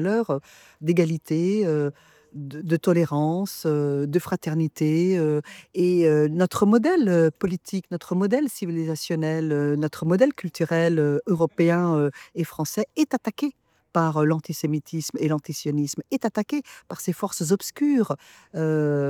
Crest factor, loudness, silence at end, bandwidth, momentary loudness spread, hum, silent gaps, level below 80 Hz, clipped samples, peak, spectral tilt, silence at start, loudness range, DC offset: 18 dB; -24 LUFS; 0 s; 18.5 kHz; 10 LU; none; none; -66 dBFS; under 0.1%; -6 dBFS; -6.5 dB/octave; 0 s; 4 LU; under 0.1%